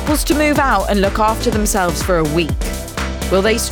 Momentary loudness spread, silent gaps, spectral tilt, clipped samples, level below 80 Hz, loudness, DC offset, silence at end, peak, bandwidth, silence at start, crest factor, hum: 8 LU; none; -4.5 dB/octave; under 0.1%; -24 dBFS; -16 LUFS; under 0.1%; 0 s; -4 dBFS; over 20 kHz; 0 s; 12 dB; none